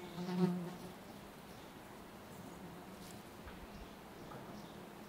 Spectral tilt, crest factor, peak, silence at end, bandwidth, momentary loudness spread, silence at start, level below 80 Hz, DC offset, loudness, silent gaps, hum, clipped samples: -6.5 dB/octave; 24 dB; -22 dBFS; 0 s; 16 kHz; 16 LU; 0 s; -66 dBFS; under 0.1%; -46 LUFS; none; none; under 0.1%